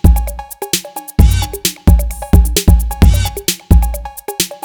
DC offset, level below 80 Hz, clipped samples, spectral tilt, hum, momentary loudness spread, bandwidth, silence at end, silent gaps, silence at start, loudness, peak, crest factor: 0.5%; -14 dBFS; 2%; -5 dB/octave; none; 9 LU; over 20 kHz; 0.1 s; none; 0.05 s; -14 LUFS; 0 dBFS; 12 dB